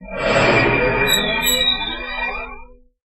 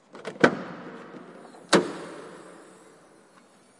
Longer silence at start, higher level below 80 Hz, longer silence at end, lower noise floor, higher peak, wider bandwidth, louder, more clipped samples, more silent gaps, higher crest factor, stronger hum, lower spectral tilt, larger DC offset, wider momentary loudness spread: second, 0 s vs 0.15 s; first, -36 dBFS vs -76 dBFS; second, 0.3 s vs 1.15 s; second, -40 dBFS vs -56 dBFS; about the same, -2 dBFS vs -2 dBFS; first, 16 kHz vs 11.5 kHz; first, -16 LUFS vs -25 LUFS; neither; neither; second, 16 dB vs 28 dB; neither; about the same, -3 dB/octave vs -4 dB/octave; neither; second, 10 LU vs 24 LU